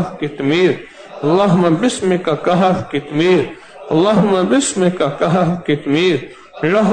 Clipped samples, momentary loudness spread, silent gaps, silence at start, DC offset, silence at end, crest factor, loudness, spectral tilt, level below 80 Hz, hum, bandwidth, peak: under 0.1%; 9 LU; none; 0 s; under 0.1%; 0 s; 12 dB; -15 LUFS; -5.5 dB/octave; -52 dBFS; none; 9.4 kHz; -4 dBFS